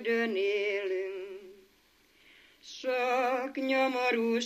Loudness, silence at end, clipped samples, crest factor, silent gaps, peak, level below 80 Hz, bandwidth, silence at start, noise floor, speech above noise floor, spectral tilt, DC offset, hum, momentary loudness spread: -30 LUFS; 0 s; under 0.1%; 16 dB; none; -16 dBFS; -78 dBFS; 15 kHz; 0 s; -65 dBFS; 36 dB; -3.5 dB/octave; under 0.1%; none; 14 LU